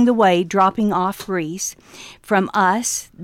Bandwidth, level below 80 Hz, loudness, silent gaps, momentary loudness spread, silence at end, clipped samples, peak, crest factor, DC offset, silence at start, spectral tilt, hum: 16.5 kHz; -56 dBFS; -19 LUFS; none; 13 LU; 0 s; under 0.1%; -4 dBFS; 14 dB; under 0.1%; 0 s; -4 dB/octave; none